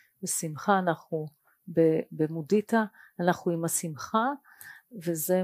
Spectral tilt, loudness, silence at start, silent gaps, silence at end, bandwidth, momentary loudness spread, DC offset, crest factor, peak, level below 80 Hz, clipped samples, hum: -5 dB/octave; -29 LUFS; 0.2 s; none; 0 s; 15.5 kHz; 12 LU; under 0.1%; 20 dB; -8 dBFS; -76 dBFS; under 0.1%; none